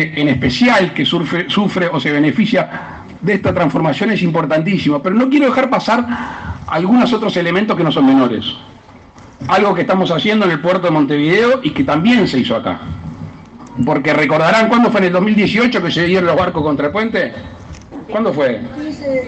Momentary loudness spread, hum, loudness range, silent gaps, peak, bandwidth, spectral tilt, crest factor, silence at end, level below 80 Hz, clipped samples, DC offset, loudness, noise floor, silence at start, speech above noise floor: 13 LU; none; 2 LU; none; 0 dBFS; 8.6 kHz; -6.5 dB/octave; 14 dB; 0 s; -44 dBFS; under 0.1%; under 0.1%; -14 LUFS; -39 dBFS; 0 s; 26 dB